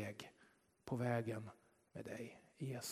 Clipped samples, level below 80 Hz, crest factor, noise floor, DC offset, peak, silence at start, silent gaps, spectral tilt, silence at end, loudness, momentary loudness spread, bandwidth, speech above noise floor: under 0.1%; -80 dBFS; 22 dB; -73 dBFS; under 0.1%; -26 dBFS; 0 s; none; -5.5 dB/octave; 0 s; -46 LUFS; 17 LU; 14 kHz; 29 dB